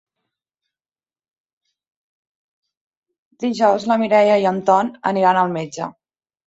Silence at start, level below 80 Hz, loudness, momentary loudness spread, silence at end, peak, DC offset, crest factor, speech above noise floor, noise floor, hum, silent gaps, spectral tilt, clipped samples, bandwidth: 3.4 s; -68 dBFS; -17 LUFS; 12 LU; 0.55 s; -2 dBFS; under 0.1%; 18 dB; over 73 dB; under -90 dBFS; none; none; -6 dB/octave; under 0.1%; 8 kHz